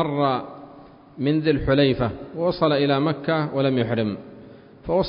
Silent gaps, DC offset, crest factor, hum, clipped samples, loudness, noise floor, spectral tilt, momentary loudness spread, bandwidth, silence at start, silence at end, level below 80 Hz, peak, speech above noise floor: none; under 0.1%; 16 dB; none; under 0.1%; -22 LUFS; -46 dBFS; -11.5 dB/octave; 16 LU; 5.4 kHz; 0 s; 0 s; -44 dBFS; -6 dBFS; 25 dB